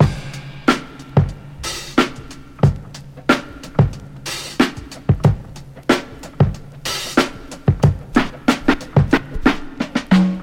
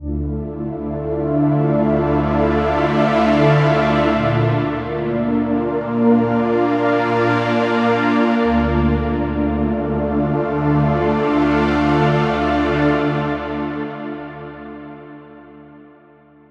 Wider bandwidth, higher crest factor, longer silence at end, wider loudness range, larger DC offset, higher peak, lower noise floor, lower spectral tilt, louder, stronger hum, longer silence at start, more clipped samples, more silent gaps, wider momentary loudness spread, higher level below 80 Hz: first, 16.5 kHz vs 7.8 kHz; about the same, 18 dB vs 16 dB; second, 0 s vs 0.7 s; about the same, 3 LU vs 5 LU; neither; about the same, 0 dBFS vs -2 dBFS; second, -35 dBFS vs -48 dBFS; second, -6 dB/octave vs -8.5 dB/octave; about the same, -19 LUFS vs -17 LUFS; neither; about the same, 0 s vs 0 s; neither; neither; about the same, 12 LU vs 10 LU; about the same, -34 dBFS vs -32 dBFS